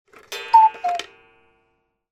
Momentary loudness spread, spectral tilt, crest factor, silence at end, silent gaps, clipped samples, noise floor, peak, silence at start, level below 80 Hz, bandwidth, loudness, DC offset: 18 LU; -0.5 dB/octave; 18 dB; 1.1 s; none; under 0.1%; -69 dBFS; -2 dBFS; 0.3 s; -70 dBFS; 13.5 kHz; -18 LUFS; under 0.1%